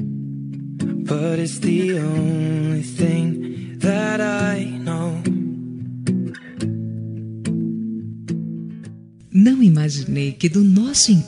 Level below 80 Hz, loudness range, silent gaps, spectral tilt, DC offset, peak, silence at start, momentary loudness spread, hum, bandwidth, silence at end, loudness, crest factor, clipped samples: -56 dBFS; 8 LU; none; -5.5 dB/octave; under 0.1%; -2 dBFS; 0 s; 15 LU; none; 11.5 kHz; 0 s; -20 LUFS; 18 dB; under 0.1%